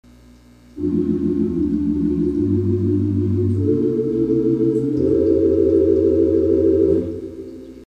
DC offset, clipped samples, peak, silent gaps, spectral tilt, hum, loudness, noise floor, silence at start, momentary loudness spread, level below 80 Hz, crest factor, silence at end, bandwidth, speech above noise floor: under 0.1%; under 0.1%; -6 dBFS; none; -11 dB/octave; none; -18 LUFS; -46 dBFS; 0.75 s; 6 LU; -40 dBFS; 12 dB; 0 s; 5.6 kHz; 28 dB